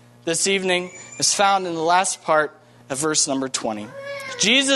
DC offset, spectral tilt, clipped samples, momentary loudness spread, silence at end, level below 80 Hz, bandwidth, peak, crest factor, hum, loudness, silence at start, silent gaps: under 0.1%; -1.5 dB/octave; under 0.1%; 14 LU; 0 s; -68 dBFS; 12.5 kHz; -2 dBFS; 18 dB; none; -20 LUFS; 0.25 s; none